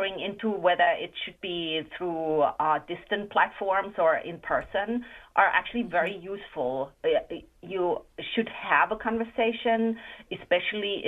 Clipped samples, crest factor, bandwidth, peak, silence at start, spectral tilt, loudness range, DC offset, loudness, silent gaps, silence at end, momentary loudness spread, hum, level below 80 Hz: under 0.1%; 20 dB; 4.2 kHz; -8 dBFS; 0 s; -6.5 dB/octave; 2 LU; under 0.1%; -27 LUFS; none; 0 s; 10 LU; none; -60 dBFS